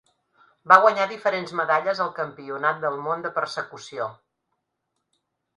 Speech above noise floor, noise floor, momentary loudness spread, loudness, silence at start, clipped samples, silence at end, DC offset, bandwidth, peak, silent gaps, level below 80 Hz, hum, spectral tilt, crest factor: 56 dB; -79 dBFS; 17 LU; -23 LUFS; 0.65 s; under 0.1%; 1.45 s; under 0.1%; 11 kHz; 0 dBFS; none; -76 dBFS; none; -4 dB/octave; 24 dB